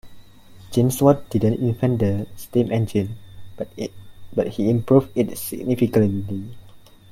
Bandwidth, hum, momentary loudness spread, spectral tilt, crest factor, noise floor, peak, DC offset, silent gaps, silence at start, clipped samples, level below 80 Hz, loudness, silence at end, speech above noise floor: 16.5 kHz; none; 15 LU; -7.5 dB/octave; 20 dB; -45 dBFS; -2 dBFS; under 0.1%; none; 0.05 s; under 0.1%; -50 dBFS; -21 LUFS; 0.35 s; 25 dB